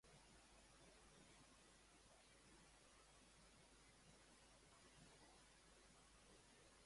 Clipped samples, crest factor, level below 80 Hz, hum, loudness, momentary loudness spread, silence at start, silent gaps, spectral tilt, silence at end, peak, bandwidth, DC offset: under 0.1%; 14 dB; -78 dBFS; none; -69 LUFS; 2 LU; 0.05 s; none; -2.5 dB/octave; 0 s; -56 dBFS; 11.5 kHz; under 0.1%